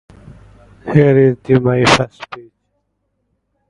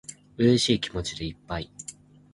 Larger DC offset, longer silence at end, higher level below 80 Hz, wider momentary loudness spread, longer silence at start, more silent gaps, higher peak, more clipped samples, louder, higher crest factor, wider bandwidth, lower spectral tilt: neither; first, 1.3 s vs 0.4 s; about the same, -44 dBFS vs -48 dBFS; about the same, 21 LU vs 20 LU; first, 0.85 s vs 0.1 s; neither; first, 0 dBFS vs -8 dBFS; neither; first, -13 LUFS vs -26 LUFS; about the same, 16 dB vs 20 dB; about the same, 11.5 kHz vs 11.5 kHz; about the same, -6 dB/octave vs -5 dB/octave